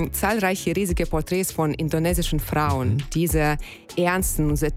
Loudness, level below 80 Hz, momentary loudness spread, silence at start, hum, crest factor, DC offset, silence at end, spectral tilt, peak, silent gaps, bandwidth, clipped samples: -23 LUFS; -32 dBFS; 3 LU; 0 s; none; 16 dB; under 0.1%; 0 s; -5 dB/octave; -6 dBFS; none; 16.5 kHz; under 0.1%